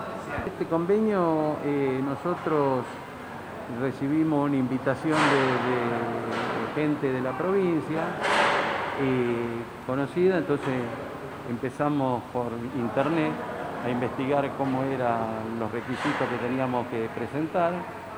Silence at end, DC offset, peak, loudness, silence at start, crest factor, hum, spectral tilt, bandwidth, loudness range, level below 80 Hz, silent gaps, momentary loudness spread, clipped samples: 0 s; under 0.1%; -10 dBFS; -27 LUFS; 0 s; 18 dB; none; -6.5 dB/octave; 16 kHz; 3 LU; -58 dBFS; none; 9 LU; under 0.1%